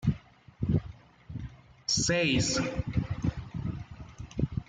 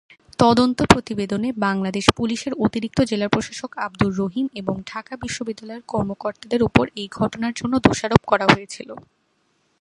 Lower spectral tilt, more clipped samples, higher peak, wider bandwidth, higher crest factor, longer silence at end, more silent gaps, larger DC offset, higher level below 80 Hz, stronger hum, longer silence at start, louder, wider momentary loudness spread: about the same, -4.5 dB/octave vs -5.5 dB/octave; neither; second, -14 dBFS vs 0 dBFS; second, 9.6 kHz vs 11.5 kHz; about the same, 18 dB vs 22 dB; second, 0.05 s vs 0.8 s; neither; neither; about the same, -46 dBFS vs -44 dBFS; neither; second, 0 s vs 0.4 s; second, -30 LUFS vs -21 LUFS; first, 19 LU vs 14 LU